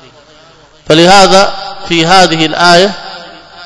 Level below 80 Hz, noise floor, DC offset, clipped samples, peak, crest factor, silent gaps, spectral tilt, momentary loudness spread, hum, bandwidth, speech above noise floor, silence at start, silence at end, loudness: -38 dBFS; -40 dBFS; under 0.1%; 6%; 0 dBFS; 8 dB; none; -3.5 dB/octave; 19 LU; none; 11 kHz; 34 dB; 0.85 s; 0 s; -6 LUFS